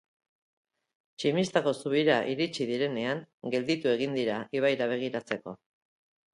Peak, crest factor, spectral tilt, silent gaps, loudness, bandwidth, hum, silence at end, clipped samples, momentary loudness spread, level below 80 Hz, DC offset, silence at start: -10 dBFS; 20 dB; -5.5 dB/octave; 3.34-3.38 s; -29 LUFS; 11.5 kHz; none; 0.8 s; under 0.1%; 8 LU; -74 dBFS; under 0.1%; 1.2 s